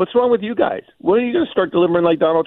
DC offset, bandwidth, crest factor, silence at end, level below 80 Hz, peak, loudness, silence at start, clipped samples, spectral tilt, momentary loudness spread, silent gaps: under 0.1%; 4.1 kHz; 14 dB; 0 s; -56 dBFS; -4 dBFS; -17 LUFS; 0 s; under 0.1%; -9.5 dB/octave; 5 LU; none